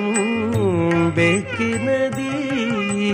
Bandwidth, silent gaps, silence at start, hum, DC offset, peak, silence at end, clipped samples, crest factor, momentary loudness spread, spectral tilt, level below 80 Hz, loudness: 15.5 kHz; none; 0 s; none; under 0.1%; -4 dBFS; 0 s; under 0.1%; 14 dB; 5 LU; -5.5 dB/octave; -52 dBFS; -20 LUFS